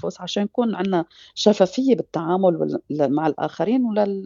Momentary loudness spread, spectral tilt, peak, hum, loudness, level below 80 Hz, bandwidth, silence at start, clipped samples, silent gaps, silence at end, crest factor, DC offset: 7 LU; -6 dB/octave; -2 dBFS; none; -21 LUFS; -68 dBFS; 7.4 kHz; 0.05 s; under 0.1%; none; 0 s; 18 dB; under 0.1%